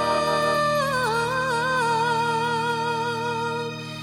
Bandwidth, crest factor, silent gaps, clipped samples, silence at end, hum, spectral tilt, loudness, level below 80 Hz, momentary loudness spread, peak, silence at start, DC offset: 17 kHz; 12 dB; none; under 0.1%; 0 s; none; -4 dB/octave; -23 LUFS; -54 dBFS; 5 LU; -10 dBFS; 0 s; under 0.1%